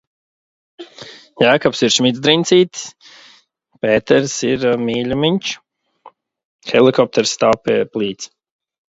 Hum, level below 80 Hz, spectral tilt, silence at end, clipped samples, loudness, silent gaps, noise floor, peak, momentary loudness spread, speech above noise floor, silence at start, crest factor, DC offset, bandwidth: none; -54 dBFS; -4 dB/octave; 0.7 s; under 0.1%; -15 LUFS; 6.45-6.59 s; -55 dBFS; 0 dBFS; 19 LU; 39 dB; 0.8 s; 18 dB; under 0.1%; 8 kHz